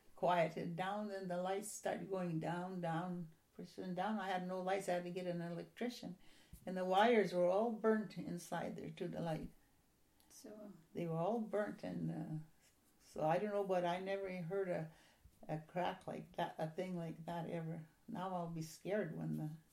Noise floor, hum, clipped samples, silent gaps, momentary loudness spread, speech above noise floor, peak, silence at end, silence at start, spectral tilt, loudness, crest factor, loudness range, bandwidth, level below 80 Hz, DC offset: -74 dBFS; none; under 0.1%; none; 15 LU; 33 dB; -22 dBFS; 0.1 s; 0.1 s; -6 dB/octave; -42 LUFS; 20 dB; 7 LU; 16 kHz; -74 dBFS; under 0.1%